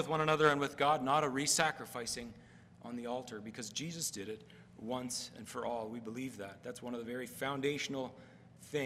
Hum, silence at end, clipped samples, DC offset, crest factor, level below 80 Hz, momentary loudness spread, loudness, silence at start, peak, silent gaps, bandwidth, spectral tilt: none; 0 s; under 0.1%; under 0.1%; 26 dB; -72 dBFS; 16 LU; -36 LUFS; 0 s; -12 dBFS; none; 16 kHz; -3.5 dB/octave